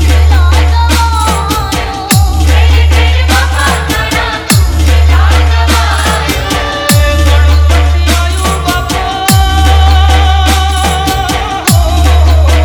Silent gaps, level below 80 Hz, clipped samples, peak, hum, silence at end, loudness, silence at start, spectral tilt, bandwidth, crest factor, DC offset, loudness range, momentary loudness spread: none; -10 dBFS; 0.6%; 0 dBFS; none; 0 s; -9 LUFS; 0 s; -4.5 dB/octave; 19.5 kHz; 8 dB; under 0.1%; 1 LU; 5 LU